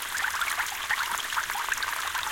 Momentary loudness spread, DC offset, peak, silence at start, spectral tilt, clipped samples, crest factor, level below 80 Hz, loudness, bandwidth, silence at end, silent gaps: 1 LU; under 0.1%; -12 dBFS; 0 s; 1.5 dB/octave; under 0.1%; 18 dB; -58 dBFS; -28 LUFS; 17 kHz; 0 s; none